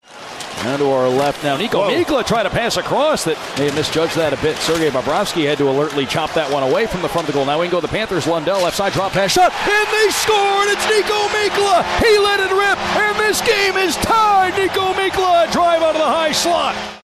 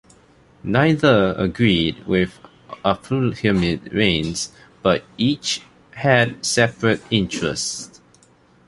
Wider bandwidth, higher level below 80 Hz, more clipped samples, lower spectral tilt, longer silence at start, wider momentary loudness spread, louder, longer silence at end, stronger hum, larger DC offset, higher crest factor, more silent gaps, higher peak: first, 14.5 kHz vs 11.5 kHz; about the same, -42 dBFS vs -44 dBFS; neither; about the same, -3.5 dB/octave vs -4.5 dB/octave; second, 0.1 s vs 0.65 s; second, 5 LU vs 10 LU; first, -16 LUFS vs -20 LUFS; second, 0.05 s vs 0.8 s; neither; neither; second, 12 dB vs 18 dB; neither; about the same, -4 dBFS vs -2 dBFS